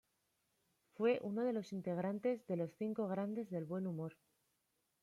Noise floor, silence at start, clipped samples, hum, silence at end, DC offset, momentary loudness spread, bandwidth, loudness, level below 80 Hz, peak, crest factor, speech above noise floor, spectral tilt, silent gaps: -84 dBFS; 1 s; under 0.1%; none; 0.9 s; under 0.1%; 7 LU; 13.5 kHz; -41 LUFS; -86 dBFS; -24 dBFS; 18 dB; 44 dB; -8.5 dB/octave; none